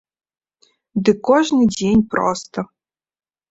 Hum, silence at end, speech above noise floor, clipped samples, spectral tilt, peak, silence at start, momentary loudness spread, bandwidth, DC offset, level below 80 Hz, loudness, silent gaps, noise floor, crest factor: none; 0.85 s; 45 dB; under 0.1%; -5.5 dB/octave; -2 dBFS; 0.95 s; 14 LU; 8 kHz; under 0.1%; -48 dBFS; -17 LUFS; none; -61 dBFS; 18 dB